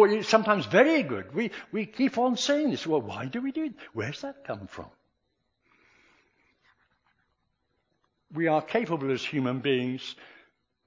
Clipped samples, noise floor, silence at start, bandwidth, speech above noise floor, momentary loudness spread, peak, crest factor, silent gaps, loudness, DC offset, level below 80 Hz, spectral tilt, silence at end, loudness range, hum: under 0.1%; -77 dBFS; 0 s; 7.6 kHz; 50 dB; 16 LU; -4 dBFS; 24 dB; none; -27 LUFS; under 0.1%; -68 dBFS; -5 dB/octave; 0.6 s; 15 LU; none